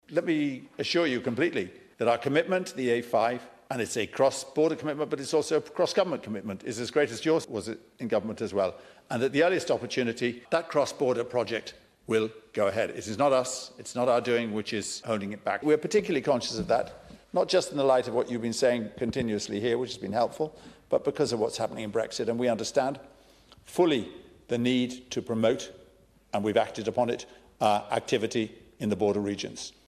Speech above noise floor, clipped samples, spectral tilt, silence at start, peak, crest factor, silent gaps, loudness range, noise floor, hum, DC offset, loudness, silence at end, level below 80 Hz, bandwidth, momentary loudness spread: 31 dB; under 0.1%; -4.5 dB/octave; 0.1 s; -8 dBFS; 20 dB; none; 2 LU; -59 dBFS; none; under 0.1%; -28 LUFS; 0.15 s; -64 dBFS; 13.5 kHz; 10 LU